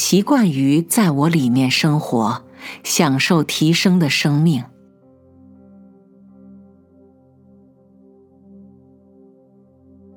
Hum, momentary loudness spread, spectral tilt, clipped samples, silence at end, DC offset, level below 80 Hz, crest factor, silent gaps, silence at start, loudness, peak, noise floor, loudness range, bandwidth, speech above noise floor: none; 8 LU; -5 dB/octave; under 0.1%; 5.5 s; under 0.1%; -68 dBFS; 18 dB; none; 0 s; -16 LUFS; 0 dBFS; -51 dBFS; 6 LU; 19 kHz; 35 dB